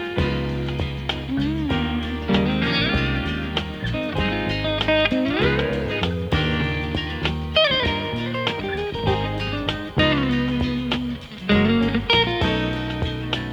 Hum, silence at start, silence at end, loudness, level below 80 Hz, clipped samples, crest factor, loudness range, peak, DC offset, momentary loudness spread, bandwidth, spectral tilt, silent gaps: none; 0 s; 0 s; -22 LUFS; -34 dBFS; under 0.1%; 20 dB; 2 LU; -2 dBFS; under 0.1%; 8 LU; 19 kHz; -6.5 dB/octave; none